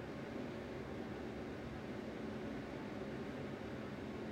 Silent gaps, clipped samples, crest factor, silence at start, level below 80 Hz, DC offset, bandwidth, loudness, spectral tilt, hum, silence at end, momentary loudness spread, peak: none; under 0.1%; 12 dB; 0 s; -62 dBFS; under 0.1%; 16 kHz; -47 LUFS; -7 dB/octave; none; 0 s; 1 LU; -34 dBFS